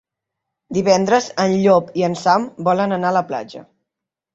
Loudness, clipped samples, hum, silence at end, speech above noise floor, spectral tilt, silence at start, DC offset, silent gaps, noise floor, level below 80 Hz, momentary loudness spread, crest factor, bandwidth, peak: -17 LUFS; under 0.1%; none; 0.7 s; 67 dB; -5.5 dB/octave; 0.7 s; under 0.1%; none; -84 dBFS; -60 dBFS; 10 LU; 16 dB; 8 kHz; -2 dBFS